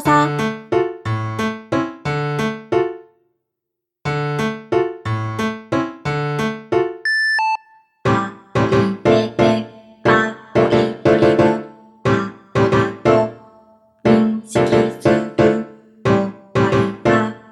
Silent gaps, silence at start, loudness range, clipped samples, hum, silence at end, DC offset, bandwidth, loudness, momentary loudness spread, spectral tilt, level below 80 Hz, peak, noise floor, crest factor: none; 0 s; 6 LU; under 0.1%; none; 0.15 s; under 0.1%; 13 kHz; -18 LUFS; 8 LU; -6.5 dB/octave; -46 dBFS; 0 dBFS; -81 dBFS; 18 dB